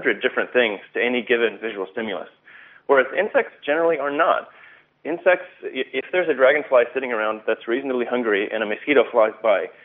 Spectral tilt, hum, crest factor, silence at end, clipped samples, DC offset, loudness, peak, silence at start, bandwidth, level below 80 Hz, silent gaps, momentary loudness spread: -1 dB/octave; none; 20 dB; 0.15 s; under 0.1%; under 0.1%; -21 LUFS; -2 dBFS; 0 s; 4 kHz; -76 dBFS; none; 11 LU